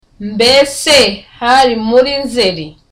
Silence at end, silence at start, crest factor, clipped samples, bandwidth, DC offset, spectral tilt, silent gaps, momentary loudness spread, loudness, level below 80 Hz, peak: 0.2 s; 0.2 s; 12 dB; under 0.1%; 16 kHz; under 0.1%; -2.5 dB/octave; none; 8 LU; -10 LUFS; -42 dBFS; 0 dBFS